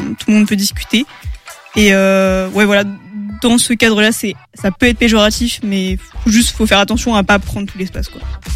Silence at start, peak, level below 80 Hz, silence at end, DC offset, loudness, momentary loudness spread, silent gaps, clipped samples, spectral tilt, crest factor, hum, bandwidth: 0 s; 0 dBFS; -28 dBFS; 0 s; under 0.1%; -13 LUFS; 14 LU; none; under 0.1%; -4 dB/octave; 14 dB; none; 16 kHz